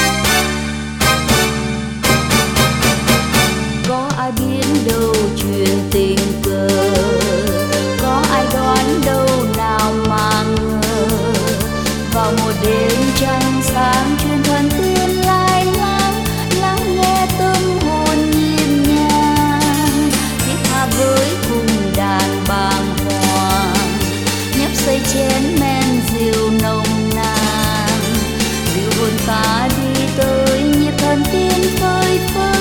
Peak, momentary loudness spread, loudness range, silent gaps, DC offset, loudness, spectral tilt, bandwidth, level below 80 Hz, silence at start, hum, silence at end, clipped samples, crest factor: 0 dBFS; 4 LU; 2 LU; none; 0.2%; -15 LUFS; -4.5 dB/octave; 19 kHz; -28 dBFS; 0 s; none; 0 s; under 0.1%; 14 dB